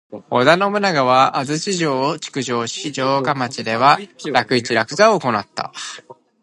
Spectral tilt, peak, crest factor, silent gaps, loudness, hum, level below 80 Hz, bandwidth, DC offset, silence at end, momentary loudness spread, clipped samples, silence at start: -4 dB/octave; 0 dBFS; 18 dB; none; -17 LUFS; none; -64 dBFS; 11.5 kHz; under 0.1%; 0.3 s; 10 LU; under 0.1%; 0.1 s